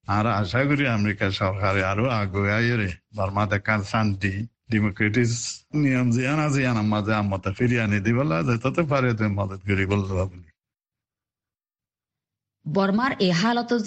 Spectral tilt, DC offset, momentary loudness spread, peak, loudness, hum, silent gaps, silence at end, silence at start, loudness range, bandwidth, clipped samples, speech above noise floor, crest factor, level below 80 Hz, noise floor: -6 dB/octave; under 0.1%; 6 LU; -8 dBFS; -23 LUFS; none; none; 0 s; 0.1 s; 6 LU; 8.8 kHz; under 0.1%; over 67 dB; 16 dB; -52 dBFS; under -90 dBFS